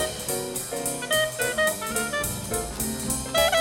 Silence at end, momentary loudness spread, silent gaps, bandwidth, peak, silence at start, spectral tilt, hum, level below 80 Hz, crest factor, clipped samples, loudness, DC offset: 0 s; 6 LU; none; 17 kHz; -8 dBFS; 0 s; -2 dB/octave; none; -44 dBFS; 18 dB; under 0.1%; -25 LUFS; under 0.1%